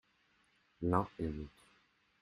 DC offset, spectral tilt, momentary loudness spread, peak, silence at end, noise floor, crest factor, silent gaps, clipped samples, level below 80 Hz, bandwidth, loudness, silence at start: under 0.1%; -9 dB/octave; 13 LU; -16 dBFS; 0.7 s; -74 dBFS; 26 dB; none; under 0.1%; -58 dBFS; 12 kHz; -38 LUFS; 0.8 s